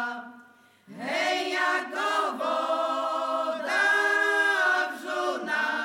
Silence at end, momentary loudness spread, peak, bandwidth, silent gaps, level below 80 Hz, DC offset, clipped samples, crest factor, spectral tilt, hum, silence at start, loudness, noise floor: 0 s; 8 LU; -12 dBFS; 17.5 kHz; none; under -90 dBFS; under 0.1%; under 0.1%; 14 dB; -1.5 dB/octave; none; 0 s; -25 LUFS; -55 dBFS